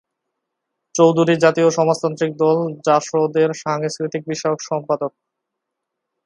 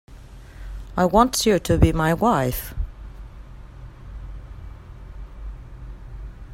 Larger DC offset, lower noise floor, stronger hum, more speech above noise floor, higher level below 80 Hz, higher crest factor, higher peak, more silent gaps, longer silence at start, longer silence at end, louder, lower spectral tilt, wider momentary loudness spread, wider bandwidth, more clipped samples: neither; first, -80 dBFS vs -41 dBFS; neither; first, 62 dB vs 23 dB; second, -68 dBFS vs -34 dBFS; about the same, 18 dB vs 22 dB; about the same, 0 dBFS vs -2 dBFS; neither; first, 0.95 s vs 0.1 s; first, 1.15 s vs 0 s; about the same, -18 LUFS vs -20 LUFS; about the same, -5.5 dB/octave vs -5.5 dB/octave; second, 9 LU vs 25 LU; second, 11 kHz vs 16 kHz; neither